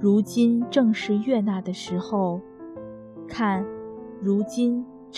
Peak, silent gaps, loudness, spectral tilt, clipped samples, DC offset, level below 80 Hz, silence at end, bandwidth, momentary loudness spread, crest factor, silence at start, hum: -6 dBFS; none; -24 LUFS; -6.5 dB/octave; under 0.1%; under 0.1%; -62 dBFS; 0 s; 13 kHz; 18 LU; 18 dB; 0 s; none